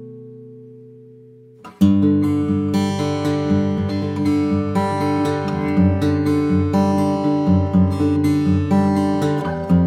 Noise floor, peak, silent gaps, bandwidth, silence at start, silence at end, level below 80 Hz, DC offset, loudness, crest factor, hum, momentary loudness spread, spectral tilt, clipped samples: -44 dBFS; -2 dBFS; none; 13 kHz; 0 s; 0 s; -52 dBFS; under 0.1%; -18 LUFS; 16 dB; none; 4 LU; -8 dB/octave; under 0.1%